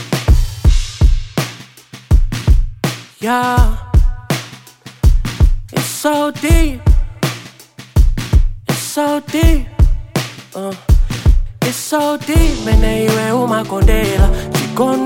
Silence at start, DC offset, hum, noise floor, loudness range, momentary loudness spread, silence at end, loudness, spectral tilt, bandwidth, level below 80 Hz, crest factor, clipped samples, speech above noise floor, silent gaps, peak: 0 s; under 0.1%; none; -38 dBFS; 2 LU; 8 LU; 0 s; -16 LUFS; -5.5 dB/octave; 17 kHz; -14 dBFS; 12 dB; under 0.1%; 25 dB; none; 0 dBFS